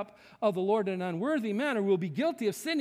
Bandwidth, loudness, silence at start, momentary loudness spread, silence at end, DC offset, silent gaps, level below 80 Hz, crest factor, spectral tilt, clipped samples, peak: 16 kHz; -30 LUFS; 0 s; 4 LU; 0 s; under 0.1%; none; -80 dBFS; 16 dB; -6 dB/octave; under 0.1%; -14 dBFS